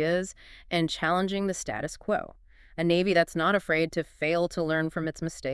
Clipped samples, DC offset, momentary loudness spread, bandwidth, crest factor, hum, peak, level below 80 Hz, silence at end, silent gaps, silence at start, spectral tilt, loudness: under 0.1%; under 0.1%; 9 LU; 12 kHz; 18 dB; none; -10 dBFS; -54 dBFS; 0 s; none; 0 s; -5 dB/octave; -28 LUFS